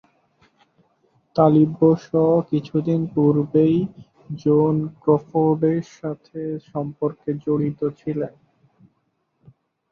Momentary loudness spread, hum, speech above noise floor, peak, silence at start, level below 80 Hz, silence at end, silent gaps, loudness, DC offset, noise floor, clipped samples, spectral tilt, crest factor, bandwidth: 13 LU; none; 50 dB; -2 dBFS; 1.35 s; -60 dBFS; 1.65 s; none; -21 LUFS; under 0.1%; -70 dBFS; under 0.1%; -10 dB/octave; 20 dB; 6.8 kHz